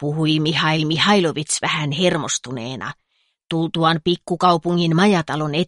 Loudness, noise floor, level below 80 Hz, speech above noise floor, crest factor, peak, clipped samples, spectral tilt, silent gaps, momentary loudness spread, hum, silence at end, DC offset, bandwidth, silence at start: -19 LUFS; -41 dBFS; -56 dBFS; 22 dB; 16 dB; -2 dBFS; under 0.1%; -4.5 dB/octave; none; 11 LU; none; 0 s; under 0.1%; 11.5 kHz; 0 s